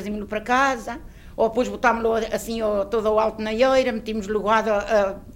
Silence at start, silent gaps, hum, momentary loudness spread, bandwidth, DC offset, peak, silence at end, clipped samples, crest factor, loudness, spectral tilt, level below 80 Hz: 0 s; none; none; 9 LU; 16.5 kHz; under 0.1%; -6 dBFS; 0 s; under 0.1%; 16 dB; -22 LUFS; -4.5 dB/octave; -44 dBFS